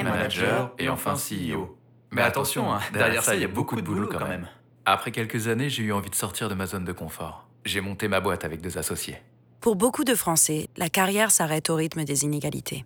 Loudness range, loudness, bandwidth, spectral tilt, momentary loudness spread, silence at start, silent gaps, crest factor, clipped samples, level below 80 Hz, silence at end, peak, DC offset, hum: 6 LU; -25 LUFS; over 20 kHz; -3.5 dB/octave; 12 LU; 0 s; none; 18 dB; under 0.1%; -58 dBFS; 0 s; -8 dBFS; under 0.1%; none